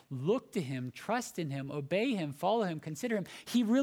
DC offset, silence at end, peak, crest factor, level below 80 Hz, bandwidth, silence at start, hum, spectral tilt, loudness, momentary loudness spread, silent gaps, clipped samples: under 0.1%; 0 s; -18 dBFS; 16 dB; -78 dBFS; 18 kHz; 0.1 s; none; -6 dB/octave; -34 LUFS; 7 LU; none; under 0.1%